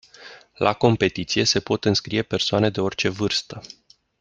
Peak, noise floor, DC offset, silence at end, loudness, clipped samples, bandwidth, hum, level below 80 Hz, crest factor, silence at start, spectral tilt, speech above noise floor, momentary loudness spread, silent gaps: -2 dBFS; -46 dBFS; under 0.1%; 0.55 s; -21 LUFS; under 0.1%; 9.6 kHz; none; -54 dBFS; 22 dB; 0.2 s; -4.5 dB/octave; 24 dB; 5 LU; none